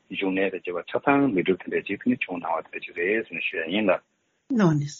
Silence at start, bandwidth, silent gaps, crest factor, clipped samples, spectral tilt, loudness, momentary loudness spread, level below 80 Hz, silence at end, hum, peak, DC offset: 0.1 s; 7.4 kHz; none; 20 dB; under 0.1%; -5 dB/octave; -25 LUFS; 8 LU; -66 dBFS; 0 s; none; -6 dBFS; under 0.1%